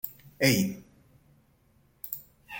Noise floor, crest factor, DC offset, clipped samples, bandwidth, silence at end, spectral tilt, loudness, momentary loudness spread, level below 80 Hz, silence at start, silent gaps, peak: -65 dBFS; 22 dB; under 0.1%; under 0.1%; 17 kHz; 0 s; -4.5 dB/octave; -29 LUFS; 19 LU; -64 dBFS; 0.05 s; none; -10 dBFS